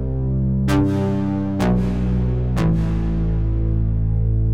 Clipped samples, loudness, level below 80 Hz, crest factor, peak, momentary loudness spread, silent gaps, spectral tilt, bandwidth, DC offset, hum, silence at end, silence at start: under 0.1%; -20 LUFS; -24 dBFS; 12 dB; -8 dBFS; 3 LU; none; -8.5 dB/octave; 11 kHz; 2%; none; 0 s; 0 s